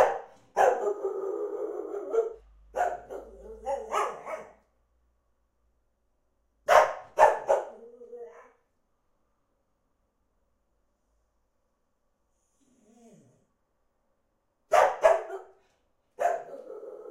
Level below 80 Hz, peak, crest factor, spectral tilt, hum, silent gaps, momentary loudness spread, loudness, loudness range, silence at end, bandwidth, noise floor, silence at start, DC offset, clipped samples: -64 dBFS; -4 dBFS; 26 dB; -2.5 dB/octave; none; none; 22 LU; -27 LUFS; 10 LU; 0 s; 16 kHz; -75 dBFS; 0 s; under 0.1%; under 0.1%